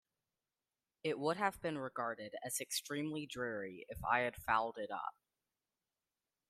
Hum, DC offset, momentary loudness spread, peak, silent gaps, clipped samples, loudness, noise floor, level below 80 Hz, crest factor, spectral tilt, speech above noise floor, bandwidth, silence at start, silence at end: none; under 0.1%; 9 LU; -18 dBFS; none; under 0.1%; -40 LUFS; under -90 dBFS; -68 dBFS; 24 dB; -3.5 dB/octave; over 50 dB; 15.5 kHz; 1.05 s; 1.4 s